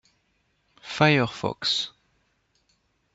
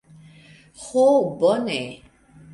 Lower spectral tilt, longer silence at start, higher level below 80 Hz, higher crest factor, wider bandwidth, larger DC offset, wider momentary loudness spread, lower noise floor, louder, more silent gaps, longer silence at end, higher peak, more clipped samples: about the same, -5 dB/octave vs -5 dB/octave; about the same, 0.85 s vs 0.8 s; about the same, -64 dBFS vs -62 dBFS; first, 24 dB vs 16 dB; second, 8 kHz vs 11.5 kHz; neither; about the same, 16 LU vs 16 LU; first, -70 dBFS vs -49 dBFS; second, -24 LUFS vs -20 LUFS; neither; first, 1.25 s vs 0.55 s; about the same, -4 dBFS vs -6 dBFS; neither